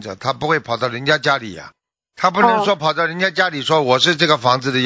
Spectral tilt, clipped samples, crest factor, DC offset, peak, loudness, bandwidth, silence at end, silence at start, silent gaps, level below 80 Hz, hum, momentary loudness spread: -4 dB/octave; under 0.1%; 18 dB; under 0.1%; 0 dBFS; -16 LUFS; 8 kHz; 0 s; 0 s; none; -58 dBFS; none; 8 LU